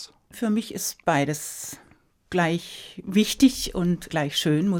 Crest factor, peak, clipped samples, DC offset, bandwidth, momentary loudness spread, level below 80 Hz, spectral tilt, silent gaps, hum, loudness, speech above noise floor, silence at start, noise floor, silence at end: 18 dB; -6 dBFS; under 0.1%; under 0.1%; 17.5 kHz; 16 LU; -50 dBFS; -4.5 dB/octave; none; none; -24 LUFS; 23 dB; 0 s; -47 dBFS; 0 s